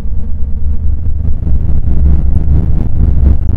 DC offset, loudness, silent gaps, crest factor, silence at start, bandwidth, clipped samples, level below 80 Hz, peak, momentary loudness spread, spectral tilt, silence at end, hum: under 0.1%; -14 LUFS; none; 8 dB; 0 s; 1.5 kHz; 2%; -10 dBFS; 0 dBFS; 7 LU; -12 dB/octave; 0 s; none